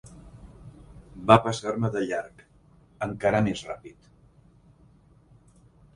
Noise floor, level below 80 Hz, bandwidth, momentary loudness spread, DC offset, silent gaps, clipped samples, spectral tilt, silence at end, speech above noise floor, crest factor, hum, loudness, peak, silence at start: -57 dBFS; -54 dBFS; 11 kHz; 29 LU; under 0.1%; none; under 0.1%; -6 dB/octave; 2.05 s; 33 dB; 28 dB; none; -25 LUFS; 0 dBFS; 0.05 s